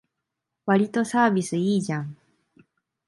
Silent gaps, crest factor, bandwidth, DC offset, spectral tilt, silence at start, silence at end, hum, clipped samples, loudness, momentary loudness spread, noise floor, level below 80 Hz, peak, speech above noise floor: none; 18 dB; 11.5 kHz; under 0.1%; -6 dB/octave; 0.65 s; 0.95 s; none; under 0.1%; -24 LUFS; 11 LU; -83 dBFS; -70 dBFS; -8 dBFS; 60 dB